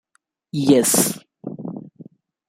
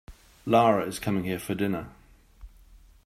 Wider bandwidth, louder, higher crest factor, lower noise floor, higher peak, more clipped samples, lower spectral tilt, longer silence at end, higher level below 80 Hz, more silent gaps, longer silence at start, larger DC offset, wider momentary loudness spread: about the same, 16.5 kHz vs 16 kHz; first, -17 LUFS vs -26 LUFS; about the same, 20 dB vs 20 dB; first, -67 dBFS vs -54 dBFS; first, -2 dBFS vs -8 dBFS; neither; second, -4 dB/octave vs -6 dB/octave; first, 0.7 s vs 0.3 s; second, -62 dBFS vs -54 dBFS; neither; first, 0.55 s vs 0.1 s; neither; first, 20 LU vs 15 LU